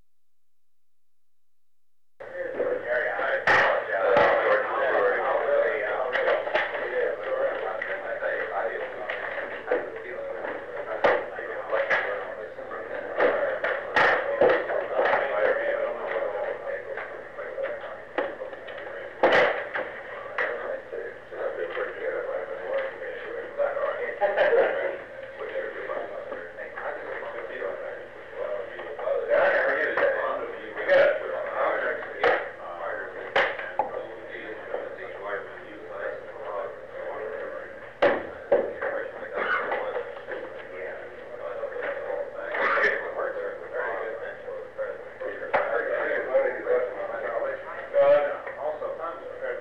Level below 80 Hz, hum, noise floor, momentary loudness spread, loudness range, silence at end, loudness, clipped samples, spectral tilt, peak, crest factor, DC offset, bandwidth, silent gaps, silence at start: -64 dBFS; 60 Hz at -65 dBFS; -86 dBFS; 15 LU; 8 LU; 0 s; -27 LUFS; under 0.1%; -4.5 dB/octave; -10 dBFS; 18 dB; 0.3%; 7.2 kHz; none; 2.2 s